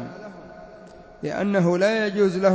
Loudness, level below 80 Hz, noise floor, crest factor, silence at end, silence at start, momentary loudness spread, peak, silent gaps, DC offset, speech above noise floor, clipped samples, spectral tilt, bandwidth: -22 LUFS; -58 dBFS; -45 dBFS; 16 dB; 0 s; 0 s; 23 LU; -6 dBFS; none; under 0.1%; 24 dB; under 0.1%; -6.5 dB/octave; 8 kHz